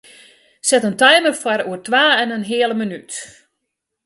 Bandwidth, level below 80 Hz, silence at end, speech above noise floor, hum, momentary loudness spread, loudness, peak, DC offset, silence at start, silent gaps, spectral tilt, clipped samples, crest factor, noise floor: 12 kHz; -68 dBFS; 0.8 s; 61 dB; none; 15 LU; -16 LUFS; 0 dBFS; under 0.1%; 0.65 s; none; -2 dB/octave; under 0.1%; 18 dB; -77 dBFS